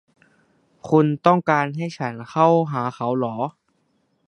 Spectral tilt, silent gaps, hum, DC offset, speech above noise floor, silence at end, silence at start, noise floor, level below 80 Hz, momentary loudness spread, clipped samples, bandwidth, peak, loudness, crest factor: -8 dB/octave; none; none; under 0.1%; 47 dB; 0.75 s; 0.85 s; -67 dBFS; -68 dBFS; 12 LU; under 0.1%; 10 kHz; 0 dBFS; -21 LUFS; 22 dB